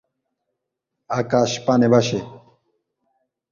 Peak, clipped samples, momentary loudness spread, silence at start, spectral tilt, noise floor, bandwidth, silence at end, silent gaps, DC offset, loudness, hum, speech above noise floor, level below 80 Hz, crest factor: -4 dBFS; under 0.1%; 12 LU; 1.1 s; -5.5 dB/octave; -80 dBFS; 7.4 kHz; 1.15 s; none; under 0.1%; -19 LUFS; none; 62 dB; -60 dBFS; 20 dB